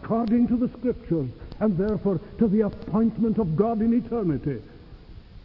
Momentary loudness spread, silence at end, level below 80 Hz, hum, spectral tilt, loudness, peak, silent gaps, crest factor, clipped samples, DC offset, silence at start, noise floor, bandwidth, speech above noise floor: 7 LU; 0.05 s; -44 dBFS; none; -12 dB/octave; -25 LUFS; -8 dBFS; none; 16 dB; under 0.1%; under 0.1%; 0 s; -44 dBFS; 5.4 kHz; 21 dB